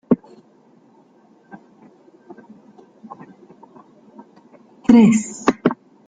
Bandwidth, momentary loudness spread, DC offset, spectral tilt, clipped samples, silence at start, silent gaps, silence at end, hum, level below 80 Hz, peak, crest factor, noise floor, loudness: 9.2 kHz; 29 LU; under 0.1%; -6.5 dB/octave; under 0.1%; 0.1 s; none; 0.35 s; none; -58 dBFS; -2 dBFS; 20 dB; -53 dBFS; -16 LUFS